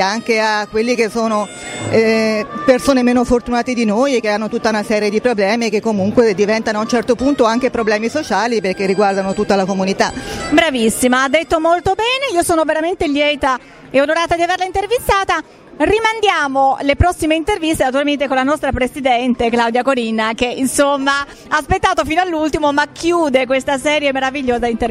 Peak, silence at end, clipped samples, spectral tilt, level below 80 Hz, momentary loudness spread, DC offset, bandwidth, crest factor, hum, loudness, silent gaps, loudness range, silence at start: 0 dBFS; 0 s; under 0.1%; -4 dB/octave; -36 dBFS; 4 LU; under 0.1%; 16 kHz; 14 dB; none; -15 LUFS; none; 1 LU; 0 s